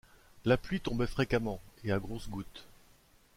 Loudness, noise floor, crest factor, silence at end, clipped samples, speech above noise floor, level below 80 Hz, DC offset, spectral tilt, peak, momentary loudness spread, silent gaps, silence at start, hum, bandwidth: -34 LUFS; -63 dBFS; 22 dB; 0.65 s; under 0.1%; 31 dB; -48 dBFS; under 0.1%; -6.5 dB/octave; -14 dBFS; 13 LU; none; 0.35 s; none; 16.5 kHz